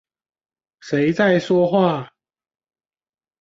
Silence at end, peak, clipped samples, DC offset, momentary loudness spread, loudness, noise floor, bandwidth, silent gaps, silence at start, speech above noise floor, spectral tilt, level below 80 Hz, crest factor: 1.35 s; -4 dBFS; under 0.1%; under 0.1%; 7 LU; -18 LUFS; under -90 dBFS; 7.8 kHz; none; 0.85 s; over 73 dB; -7 dB/octave; -62 dBFS; 18 dB